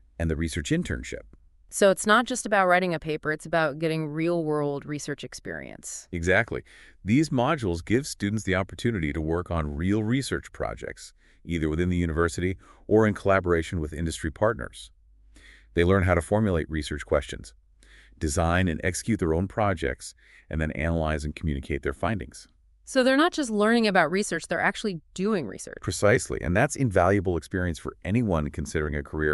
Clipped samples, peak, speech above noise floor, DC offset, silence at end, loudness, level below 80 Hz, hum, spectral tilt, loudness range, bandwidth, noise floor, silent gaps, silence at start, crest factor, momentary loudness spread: under 0.1%; -6 dBFS; 29 dB; under 0.1%; 0 s; -26 LUFS; -42 dBFS; none; -5.5 dB/octave; 4 LU; 12 kHz; -54 dBFS; none; 0.2 s; 20 dB; 13 LU